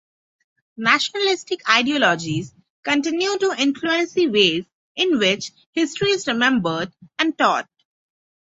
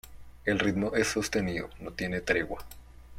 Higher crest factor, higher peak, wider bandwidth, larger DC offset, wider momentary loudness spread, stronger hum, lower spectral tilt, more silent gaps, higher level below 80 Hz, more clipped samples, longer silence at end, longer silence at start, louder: about the same, 20 dB vs 22 dB; first, -2 dBFS vs -10 dBFS; second, 8 kHz vs 16.5 kHz; neither; about the same, 10 LU vs 11 LU; neither; about the same, -3.5 dB/octave vs -4.5 dB/octave; first, 2.70-2.83 s, 4.73-4.95 s, 5.66-5.73 s vs none; second, -62 dBFS vs -50 dBFS; neither; first, 0.9 s vs 0 s; first, 0.8 s vs 0.05 s; first, -20 LUFS vs -30 LUFS